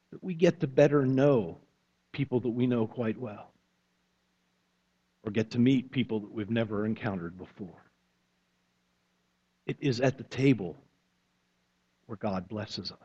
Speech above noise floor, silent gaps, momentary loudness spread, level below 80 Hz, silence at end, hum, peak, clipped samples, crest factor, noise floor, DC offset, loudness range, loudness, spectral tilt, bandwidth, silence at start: 46 dB; none; 18 LU; -66 dBFS; 0.1 s; none; -8 dBFS; under 0.1%; 24 dB; -75 dBFS; under 0.1%; 8 LU; -29 LUFS; -7.5 dB/octave; 7.8 kHz; 0.1 s